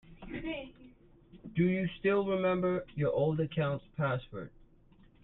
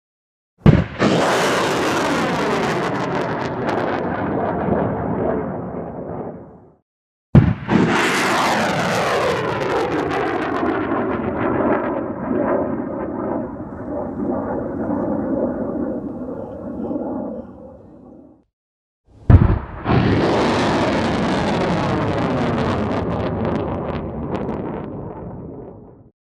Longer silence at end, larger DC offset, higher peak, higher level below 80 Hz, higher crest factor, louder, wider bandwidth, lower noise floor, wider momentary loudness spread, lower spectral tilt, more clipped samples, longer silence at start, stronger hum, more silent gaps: first, 0.75 s vs 0.35 s; neither; second, -18 dBFS vs 0 dBFS; second, -58 dBFS vs -34 dBFS; about the same, 16 dB vs 20 dB; second, -33 LUFS vs -20 LUFS; second, 4.1 kHz vs 15 kHz; first, -61 dBFS vs -44 dBFS; first, 16 LU vs 13 LU; first, -10.5 dB/octave vs -6.5 dB/octave; neither; second, 0.1 s vs 0.65 s; neither; second, none vs 6.82-7.33 s, 18.53-19.04 s